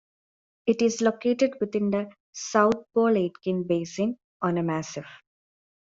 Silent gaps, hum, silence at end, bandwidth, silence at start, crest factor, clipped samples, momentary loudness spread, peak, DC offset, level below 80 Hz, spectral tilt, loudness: 2.20-2.33 s, 4.24-4.40 s; none; 0.8 s; 7.8 kHz; 0.65 s; 20 dB; under 0.1%; 9 LU; -6 dBFS; under 0.1%; -68 dBFS; -5.5 dB/octave; -26 LUFS